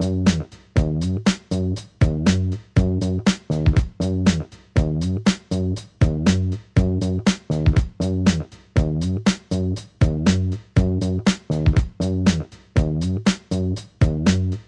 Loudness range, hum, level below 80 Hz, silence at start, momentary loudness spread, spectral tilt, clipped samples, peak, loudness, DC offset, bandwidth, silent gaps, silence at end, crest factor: 1 LU; none; -30 dBFS; 0 s; 5 LU; -6.5 dB/octave; under 0.1%; -4 dBFS; -21 LUFS; under 0.1%; 11 kHz; none; 0.05 s; 16 dB